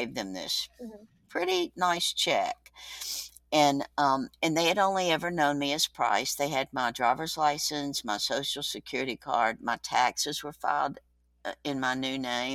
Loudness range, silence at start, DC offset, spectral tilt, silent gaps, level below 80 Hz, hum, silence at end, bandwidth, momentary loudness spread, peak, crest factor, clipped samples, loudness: 3 LU; 0 s; under 0.1%; -2.5 dB/octave; none; -64 dBFS; 60 Hz at -65 dBFS; 0 s; 18 kHz; 9 LU; -8 dBFS; 20 dB; under 0.1%; -29 LUFS